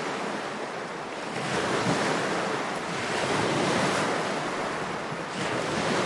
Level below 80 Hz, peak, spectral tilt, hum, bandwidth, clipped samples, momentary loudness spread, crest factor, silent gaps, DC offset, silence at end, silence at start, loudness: -62 dBFS; -12 dBFS; -4 dB/octave; none; 11.5 kHz; under 0.1%; 8 LU; 16 dB; none; under 0.1%; 0 s; 0 s; -28 LUFS